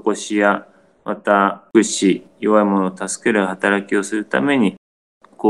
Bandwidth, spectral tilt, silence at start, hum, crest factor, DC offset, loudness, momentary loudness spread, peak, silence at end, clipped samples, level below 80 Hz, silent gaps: 12 kHz; -4.5 dB/octave; 0.05 s; none; 18 dB; under 0.1%; -18 LUFS; 7 LU; 0 dBFS; 0 s; under 0.1%; -66 dBFS; 4.78-5.21 s